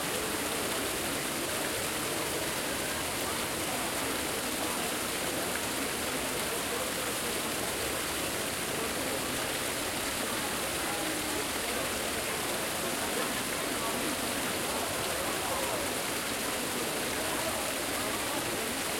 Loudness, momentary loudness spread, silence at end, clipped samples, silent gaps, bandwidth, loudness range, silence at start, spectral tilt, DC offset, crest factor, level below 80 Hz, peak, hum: -31 LUFS; 1 LU; 0 s; under 0.1%; none; 16.5 kHz; 0 LU; 0 s; -2 dB/octave; under 0.1%; 16 dB; -56 dBFS; -16 dBFS; none